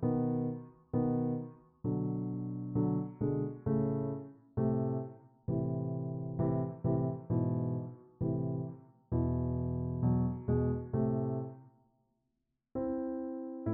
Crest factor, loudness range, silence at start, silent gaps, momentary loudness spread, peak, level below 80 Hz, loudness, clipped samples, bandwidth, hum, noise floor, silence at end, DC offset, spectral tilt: 14 dB; 1 LU; 0 s; none; 8 LU; -20 dBFS; -56 dBFS; -35 LUFS; under 0.1%; 2.2 kHz; none; -83 dBFS; 0 s; under 0.1%; -14 dB/octave